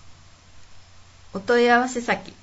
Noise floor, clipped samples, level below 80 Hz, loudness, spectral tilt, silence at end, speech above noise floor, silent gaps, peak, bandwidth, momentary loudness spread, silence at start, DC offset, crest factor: -47 dBFS; under 0.1%; -56 dBFS; -21 LUFS; -4 dB/octave; 0.1 s; 27 dB; none; -4 dBFS; 8 kHz; 16 LU; 0.05 s; under 0.1%; 20 dB